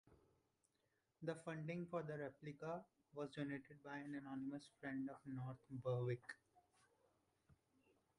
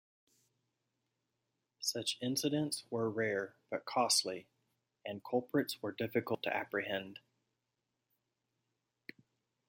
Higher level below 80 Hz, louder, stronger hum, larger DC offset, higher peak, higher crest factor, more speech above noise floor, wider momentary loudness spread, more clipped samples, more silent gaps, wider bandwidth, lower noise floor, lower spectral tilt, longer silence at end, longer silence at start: about the same, -84 dBFS vs -84 dBFS; second, -50 LUFS vs -36 LUFS; neither; neither; second, -34 dBFS vs -18 dBFS; about the same, 18 dB vs 22 dB; second, 37 dB vs 50 dB; second, 8 LU vs 19 LU; neither; neither; second, 11 kHz vs 16.5 kHz; about the same, -87 dBFS vs -87 dBFS; first, -7.5 dB/octave vs -3 dB/octave; second, 0.65 s vs 2.55 s; second, 0.05 s vs 1.8 s